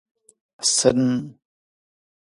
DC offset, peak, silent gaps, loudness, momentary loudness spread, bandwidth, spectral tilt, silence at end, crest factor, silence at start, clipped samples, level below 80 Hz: under 0.1%; -2 dBFS; none; -20 LUFS; 12 LU; 11.5 kHz; -3.5 dB/octave; 1.05 s; 24 dB; 0.6 s; under 0.1%; -56 dBFS